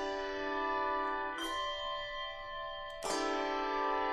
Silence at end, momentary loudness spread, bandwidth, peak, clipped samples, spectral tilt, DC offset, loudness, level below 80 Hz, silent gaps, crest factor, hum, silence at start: 0 s; 8 LU; 13.5 kHz; -22 dBFS; under 0.1%; -2 dB/octave; under 0.1%; -36 LUFS; -56 dBFS; none; 14 dB; none; 0 s